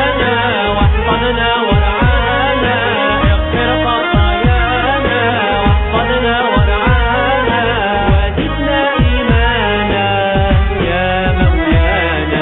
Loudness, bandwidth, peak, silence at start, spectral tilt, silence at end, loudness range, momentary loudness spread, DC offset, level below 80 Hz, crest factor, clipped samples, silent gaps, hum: -13 LUFS; 4.1 kHz; 0 dBFS; 0 s; -4 dB/octave; 0 s; 0 LU; 2 LU; under 0.1%; -18 dBFS; 12 dB; under 0.1%; none; none